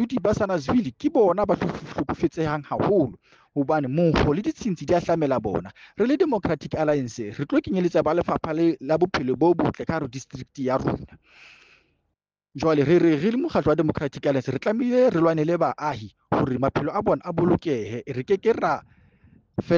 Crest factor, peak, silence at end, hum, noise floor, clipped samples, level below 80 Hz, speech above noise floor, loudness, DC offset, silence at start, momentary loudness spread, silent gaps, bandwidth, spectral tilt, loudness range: 16 dB; -8 dBFS; 0 s; none; -79 dBFS; under 0.1%; -48 dBFS; 56 dB; -23 LUFS; under 0.1%; 0 s; 10 LU; none; 7.4 kHz; -7.5 dB/octave; 3 LU